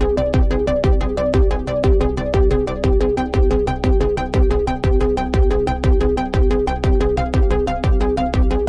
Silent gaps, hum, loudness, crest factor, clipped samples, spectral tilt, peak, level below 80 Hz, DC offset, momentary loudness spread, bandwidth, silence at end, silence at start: none; none; -18 LUFS; 10 dB; under 0.1%; -8 dB/octave; -6 dBFS; -18 dBFS; under 0.1%; 2 LU; 8.8 kHz; 0 s; 0 s